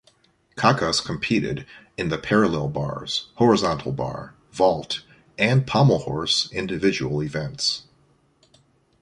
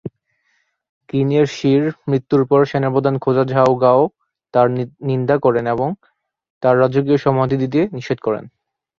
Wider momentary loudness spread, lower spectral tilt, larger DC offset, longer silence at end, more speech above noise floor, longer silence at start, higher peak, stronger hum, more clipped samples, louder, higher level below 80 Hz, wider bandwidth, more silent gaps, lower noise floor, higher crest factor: first, 12 LU vs 8 LU; second, -5 dB/octave vs -8 dB/octave; neither; first, 1.2 s vs 0.5 s; second, 39 dB vs 50 dB; first, 0.55 s vs 0.05 s; about the same, -2 dBFS vs -2 dBFS; neither; neither; second, -22 LUFS vs -17 LUFS; first, -50 dBFS vs -56 dBFS; first, 11.5 kHz vs 7.2 kHz; second, none vs 0.89-1.01 s, 6.50-6.61 s; second, -61 dBFS vs -65 dBFS; first, 22 dB vs 16 dB